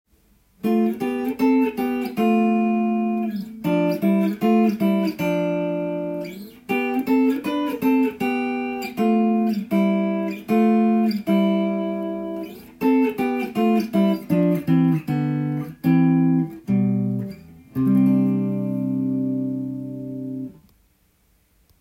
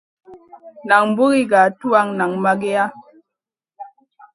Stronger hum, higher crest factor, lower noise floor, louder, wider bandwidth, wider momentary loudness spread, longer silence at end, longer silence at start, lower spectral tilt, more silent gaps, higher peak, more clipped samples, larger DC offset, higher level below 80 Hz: neither; about the same, 14 dB vs 18 dB; second, -62 dBFS vs -85 dBFS; second, -21 LUFS vs -16 LUFS; first, 16.5 kHz vs 11 kHz; first, 11 LU vs 7 LU; first, 1.3 s vs 0.45 s; first, 0.65 s vs 0.3 s; first, -8.5 dB/octave vs -5.5 dB/octave; neither; second, -8 dBFS vs 0 dBFS; neither; neither; first, -60 dBFS vs -66 dBFS